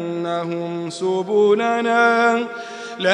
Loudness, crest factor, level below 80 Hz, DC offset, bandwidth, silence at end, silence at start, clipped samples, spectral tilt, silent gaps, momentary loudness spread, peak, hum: -19 LUFS; 18 dB; -78 dBFS; under 0.1%; 10 kHz; 0 s; 0 s; under 0.1%; -5 dB/octave; none; 12 LU; 0 dBFS; none